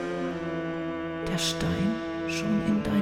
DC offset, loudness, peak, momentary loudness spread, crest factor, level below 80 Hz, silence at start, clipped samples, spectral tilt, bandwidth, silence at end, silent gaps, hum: under 0.1%; -29 LUFS; -14 dBFS; 6 LU; 14 dB; -48 dBFS; 0 s; under 0.1%; -5 dB/octave; 16 kHz; 0 s; none; none